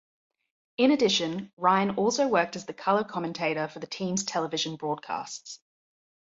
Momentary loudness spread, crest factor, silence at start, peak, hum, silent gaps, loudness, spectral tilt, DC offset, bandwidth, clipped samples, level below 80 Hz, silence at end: 11 LU; 20 dB; 0.8 s; -8 dBFS; none; 1.53-1.57 s; -27 LUFS; -4 dB/octave; under 0.1%; 7.8 kHz; under 0.1%; -70 dBFS; 0.65 s